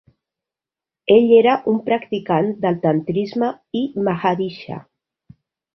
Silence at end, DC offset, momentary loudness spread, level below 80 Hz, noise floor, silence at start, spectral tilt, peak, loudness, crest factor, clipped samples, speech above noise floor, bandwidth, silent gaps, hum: 0.95 s; under 0.1%; 14 LU; -60 dBFS; -89 dBFS; 1.1 s; -9 dB/octave; -2 dBFS; -18 LUFS; 18 dB; under 0.1%; 71 dB; 6 kHz; none; none